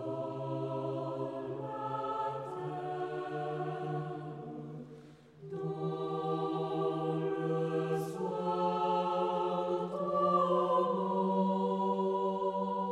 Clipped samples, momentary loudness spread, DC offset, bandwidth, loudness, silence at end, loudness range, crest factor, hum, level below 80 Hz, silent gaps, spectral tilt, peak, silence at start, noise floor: under 0.1%; 10 LU; under 0.1%; 13 kHz; -34 LUFS; 0 s; 8 LU; 16 dB; none; -76 dBFS; none; -8 dB/octave; -18 dBFS; 0 s; -54 dBFS